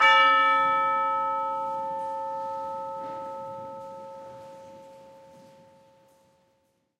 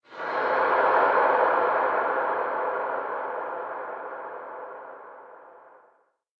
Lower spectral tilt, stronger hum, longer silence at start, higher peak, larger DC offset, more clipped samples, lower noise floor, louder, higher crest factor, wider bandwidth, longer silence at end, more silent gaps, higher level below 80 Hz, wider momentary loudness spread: second, -2.5 dB/octave vs -5.5 dB/octave; neither; about the same, 0 s vs 0.1 s; about the same, -8 dBFS vs -8 dBFS; neither; neither; first, -71 dBFS vs -64 dBFS; about the same, -25 LUFS vs -25 LUFS; about the same, 20 dB vs 18 dB; first, 10 kHz vs 6 kHz; first, 1.8 s vs 0.8 s; neither; second, -78 dBFS vs -72 dBFS; first, 24 LU vs 19 LU